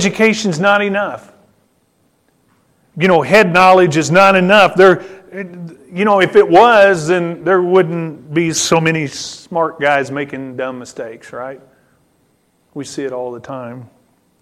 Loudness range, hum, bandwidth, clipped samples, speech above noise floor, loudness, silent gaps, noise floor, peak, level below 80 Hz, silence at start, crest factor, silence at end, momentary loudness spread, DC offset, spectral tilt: 16 LU; none; 15 kHz; under 0.1%; 46 dB; -12 LUFS; none; -59 dBFS; 0 dBFS; -54 dBFS; 0 s; 14 dB; 0.55 s; 20 LU; under 0.1%; -4.5 dB/octave